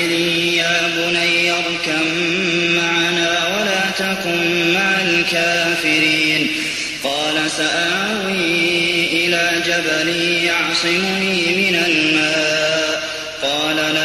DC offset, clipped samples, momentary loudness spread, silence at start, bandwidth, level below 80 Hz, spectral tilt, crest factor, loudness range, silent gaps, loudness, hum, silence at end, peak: under 0.1%; under 0.1%; 4 LU; 0 s; 13.5 kHz; -54 dBFS; -2.5 dB/octave; 14 dB; 1 LU; none; -15 LUFS; none; 0 s; -2 dBFS